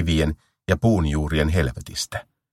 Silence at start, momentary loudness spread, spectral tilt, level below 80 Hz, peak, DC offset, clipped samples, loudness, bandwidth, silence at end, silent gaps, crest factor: 0 s; 10 LU; -5.5 dB/octave; -32 dBFS; -2 dBFS; under 0.1%; under 0.1%; -23 LUFS; 14.5 kHz; 0.3 s; none; 20 dB